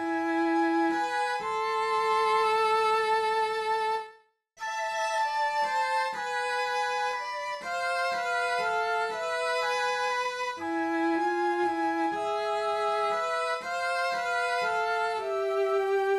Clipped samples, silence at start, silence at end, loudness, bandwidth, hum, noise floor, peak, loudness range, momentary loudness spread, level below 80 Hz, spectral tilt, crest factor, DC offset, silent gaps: under 0.1%; 0 s; 0 s; -28 LUFS; 13.5 kHz; none; -58 dBFS; -16 dBFS; 3 LU; 6 LU; -72 dBFS; -2.5 dB/octave; 12 dB; under 0.1%; none